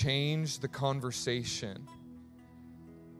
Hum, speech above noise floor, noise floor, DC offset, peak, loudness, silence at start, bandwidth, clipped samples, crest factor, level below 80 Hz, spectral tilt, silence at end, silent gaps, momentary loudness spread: none; 20 dB; -54 dBFS; under 0.1%; -16 dBFS; -34 LUFS; 0 s; 15 kHz; under 0.1%; 20 dB; -60 dBFS; -4.5 dB/octave; 0 s; none; 22 LU